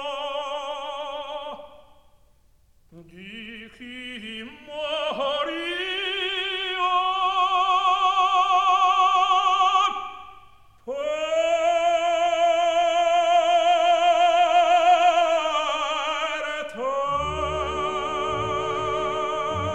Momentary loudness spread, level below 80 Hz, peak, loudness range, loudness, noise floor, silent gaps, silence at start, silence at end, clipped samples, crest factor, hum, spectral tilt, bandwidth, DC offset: 16 LU; -52 dBFS; -8 dBFS; 16 LU; -22 LUFS; -59 dBFS; none; 0 s; 0 s; under 0.1%; 14 dB; none; -3 dB/octave; 9 kHz; 0.2%